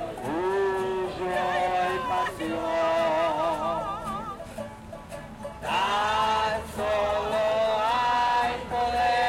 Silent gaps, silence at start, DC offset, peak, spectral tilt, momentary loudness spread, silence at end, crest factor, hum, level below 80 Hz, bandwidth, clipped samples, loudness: none; 0 s; under 0.1%; -12 dBFS; -4.5 dB/octave; 14 LU; 0 s; 14 dB; none; -50 dBFS; 16.5 kHz; under 0.1%; -26 LUFS